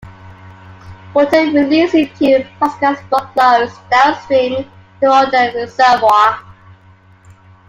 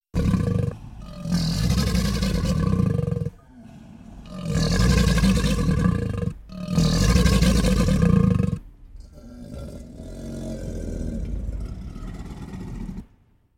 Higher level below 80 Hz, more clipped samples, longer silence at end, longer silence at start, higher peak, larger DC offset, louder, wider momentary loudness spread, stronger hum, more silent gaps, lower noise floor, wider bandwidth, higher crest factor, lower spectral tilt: second, -52 dBFS vs -30 dBFS; neither; first, 1.3 s vs 0.55 s; about the same, 0.05 s vs 0.15 s; first, 0 dBFS vs -6 dBFS; neither; first, -13 LUFS vs -23 LUFS; second, 8 LU vs 20 LU; neither; neither; second, -45 dBFS vs -58 dBFS; about the same, 16 kHz vs 16.5 kHz; about the same, 14 dB vs 18 dB; about the same, -5 dB/octave vs -6 dB/octave